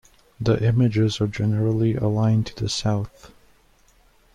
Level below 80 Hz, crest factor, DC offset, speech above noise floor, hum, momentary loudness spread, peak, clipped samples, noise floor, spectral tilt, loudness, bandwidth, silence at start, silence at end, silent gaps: -48 dBFS; 14 dB; under 0.1%; 36 dB; none; 7 LU; -8 dBFS; under 0.1%; -57 dBFS; -7 dB/octave; -22 LUFS; 9.8 kHz; 0.4 s; 1.05 s; none